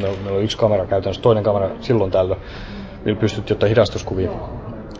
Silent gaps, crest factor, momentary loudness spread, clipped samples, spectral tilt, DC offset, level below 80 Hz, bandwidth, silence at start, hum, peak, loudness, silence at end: none; 18 dB; 14 LU; under 0.1%; -7 dB/octave; under 0.1%; -36 dBFS; 8 kHz; 0 s; none; -2 dBFS; -19 LUFS; 0 s